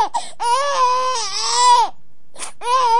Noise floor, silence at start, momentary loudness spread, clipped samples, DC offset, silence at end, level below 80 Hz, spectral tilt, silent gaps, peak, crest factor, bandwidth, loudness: -48 dBFS; 0 s; 13 LU; under 0.1%; 4%; 0 s; -64 dBFS; 1 dB/octave; none; -2 dBFS; 14 dB; 11.5 kHz; -17 LUFS